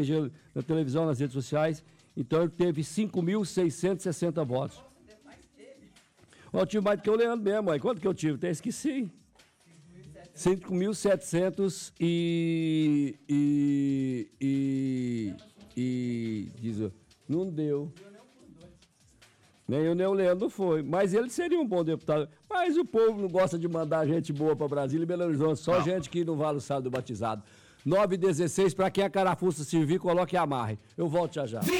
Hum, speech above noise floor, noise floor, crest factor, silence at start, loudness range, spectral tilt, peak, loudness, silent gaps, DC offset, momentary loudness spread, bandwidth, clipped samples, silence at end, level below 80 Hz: none; 33 dB; -62 dBFS; 12 dB; 0 s; 5 LU; -6.5 dB/octave; -18 dBFS; -29 LUFS; none; under 0.1%; 8 LU; 16 kHz; under 0.1%; 0 s; -64 dBFS